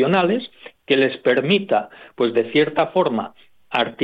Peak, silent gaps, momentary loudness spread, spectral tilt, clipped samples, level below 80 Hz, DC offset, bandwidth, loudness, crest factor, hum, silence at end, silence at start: -4 dBFS; none; 9 LU; -7.5 dB/octave; under 0.1%; -68 dBFS; under 0.1%; 5.6 kHz; -20 LUFS; 16 dB; none; 0 s; 0 s